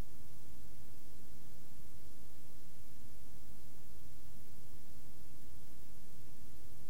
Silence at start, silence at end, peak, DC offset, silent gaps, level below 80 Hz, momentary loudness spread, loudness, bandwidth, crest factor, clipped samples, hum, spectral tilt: 0 s; 0 s; -28 dBFS; 4%; none; -64 dBFS; 1 LU; -59 LUFS; 17 kHz; 14 dB; under 0.1%; 60 Hz at -65 dBFS; -5 dB/octave